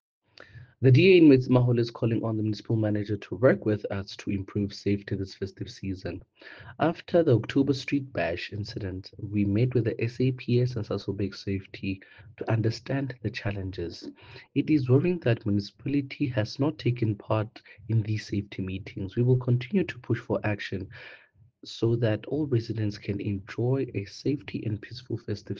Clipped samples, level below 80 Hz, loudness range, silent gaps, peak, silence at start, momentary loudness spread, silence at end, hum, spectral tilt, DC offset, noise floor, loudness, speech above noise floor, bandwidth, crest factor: under 0.1%; -60 dBFS; 7 LU; none; -8 dBFS; 0.55 s; 14 LU; 0 s; none; -8 dB/octave; under 0.1%; -50 dBFS; -27 LUFS; 23 dB; 7.2 kHz; 20 dB